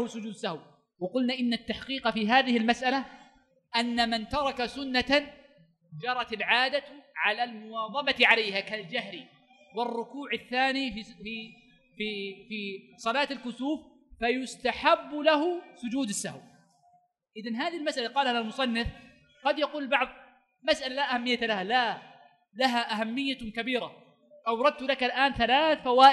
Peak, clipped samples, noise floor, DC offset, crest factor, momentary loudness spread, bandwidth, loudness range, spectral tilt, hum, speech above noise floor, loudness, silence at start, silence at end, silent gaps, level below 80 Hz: -6 dBFS; under 0.1%; -66 dBFS; under 0.1%; 24 dB; 13 LU; 12 kHz; 6 LU; -3.5 dB/octave; none; 38 dB; -28 LUFS; 0 s; 0 s; none; -58 dBFS